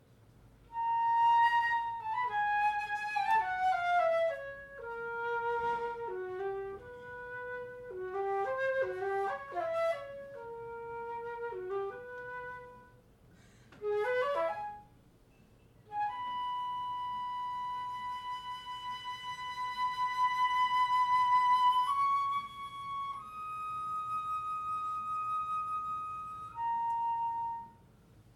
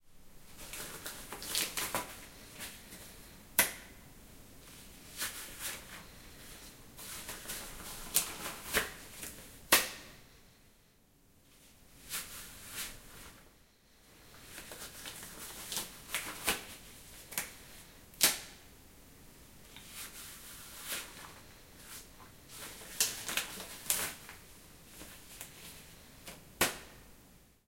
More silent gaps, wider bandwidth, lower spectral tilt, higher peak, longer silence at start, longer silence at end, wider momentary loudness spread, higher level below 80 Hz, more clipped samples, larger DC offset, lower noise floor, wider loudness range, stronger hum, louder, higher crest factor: neither; second, 13 kHz vs 16.5 kHz; first, -3.5 dB/octave vs -0.5 dB/octave; second, -20 dBFS vs -4 dBFS; first, 0.4 s vs 0 s; about the same, 0.15 s vs 0.1 s; second, 15 LU vs 22 LU; second, -68 dBFS vs -60 dBFS; neither; neither; second, -62 dBFS vs -66 dBFS; second, 9 LU vs 12 LU; neither; about the same, -34 LUFS vs -36 LUFS; second, 16 dB vs 38 dB